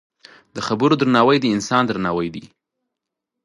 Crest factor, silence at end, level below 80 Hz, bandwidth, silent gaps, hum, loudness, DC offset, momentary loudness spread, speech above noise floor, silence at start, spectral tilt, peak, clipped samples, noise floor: 20 dB; 1 s; -56 dBFS; 11.5 kHz; none; none; -18 LUFS; under 0.1%; 14 LU; 64 dB; 0.55 s; -5.5 dB/octave; 0 dBFS; under 0.1%; -82 dBFS